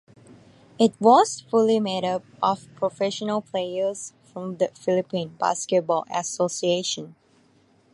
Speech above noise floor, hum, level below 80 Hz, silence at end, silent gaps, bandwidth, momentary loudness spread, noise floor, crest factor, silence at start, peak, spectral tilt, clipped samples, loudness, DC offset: 37 dB; none; -72 dBFS; 0.8 s; none; 11.5 kHz; 11 LU; -60 dBFS; 20 dB; 0.3 s; -4 dBFS; -4.5 dB/octave; under 0.1%; -23 LUFS; under 0.1%